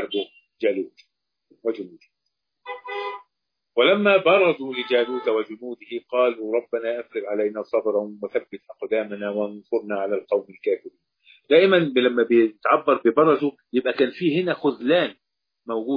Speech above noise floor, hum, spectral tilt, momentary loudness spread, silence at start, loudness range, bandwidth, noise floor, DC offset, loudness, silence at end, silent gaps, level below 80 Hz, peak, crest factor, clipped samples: 60 dB; none; -8 dB/octave; 15 LU; 0 s; 7 LU; 5.2 kHz; -81 dBFS; under 0.1%; -22 LUFS; 0 s; none; -74 dBFS; -4 dBFS; 20 dB; under 0.1%